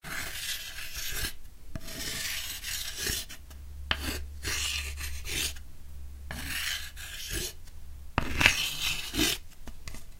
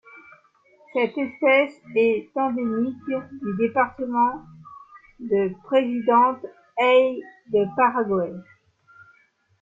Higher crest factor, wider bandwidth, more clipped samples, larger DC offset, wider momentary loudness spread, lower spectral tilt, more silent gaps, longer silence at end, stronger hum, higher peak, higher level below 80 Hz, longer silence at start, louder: first, 32 dB vs 18 dB; first, 16 kHz vs 7.4 kHz; neither; neither; first, 19 LU vs 12 LU; second, -1.5 dB/octave vs -7.5 dB/octave; neither; second, 0 s vs 1.2 s; neither; first, 0 dBFS vs -6 dBFS; first, -42 dBFS vs -66 dBFS; about the same, 0.05 s vs 0.15 s; second, -31 LUFS vs -22 LUFS